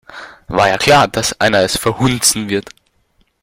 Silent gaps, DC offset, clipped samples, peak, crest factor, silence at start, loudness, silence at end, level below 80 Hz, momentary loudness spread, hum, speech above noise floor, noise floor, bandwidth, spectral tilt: none; under 0.1%; under 0.1%; 0 dBFS; 16 dB; 0.1 s; -13 LUFS; 0.8 s; -42 dBFS; 11 LU; none; 45 dB; -58 dBFS; 16.5 kHz; -3 dB/octave